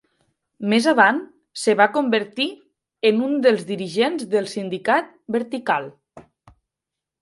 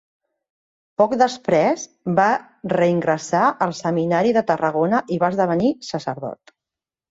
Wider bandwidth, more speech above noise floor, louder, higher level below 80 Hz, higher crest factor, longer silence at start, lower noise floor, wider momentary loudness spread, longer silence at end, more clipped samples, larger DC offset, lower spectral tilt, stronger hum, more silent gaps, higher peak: first, 11.5 kHz vs 8 kHz; about the same, 66 dB vs 69 dB; about the same, -20 LUFS vs -20 LUFS; second, -70 dBFS vs -62 dBFS; first, 22 dB vs 16 dB; second, 0.6 s vs 1 s; about the same, -86 dBFS vs -88 dBFS; about the same, 10 LU vs 9 LU; first, 1 s vs 0.75 s; neither; neither; second, -4.5 dB/octave vs -6 dB/octave; neither; neither; first, 0 dBFS vs -4 dBFS